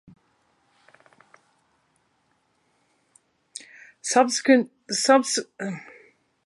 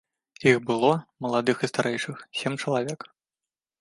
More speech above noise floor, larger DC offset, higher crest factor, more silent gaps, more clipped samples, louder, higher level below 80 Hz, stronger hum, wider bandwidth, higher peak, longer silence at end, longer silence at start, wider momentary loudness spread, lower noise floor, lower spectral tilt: second, 48 dB vs over 65 dB; neither; about the same, 24 dB vs 22 dB; neither; neither; first, -22 LUFS vs -26 LUFS; second, -80 dBFS vs -70 dBFS; neither; about the same, 11.5 kHz vs 11.5 kHz; about the same, -4 dBFS vs -4 dBFS; about the same, 0.65 s vs 0.75 s; first, 4.05 s vs 0.4 s; first, 22 LU vs 10 LU; second, -69 dBFS vs under -90 dBFS; second, -2.5 dB/octave vs -5 dB/octave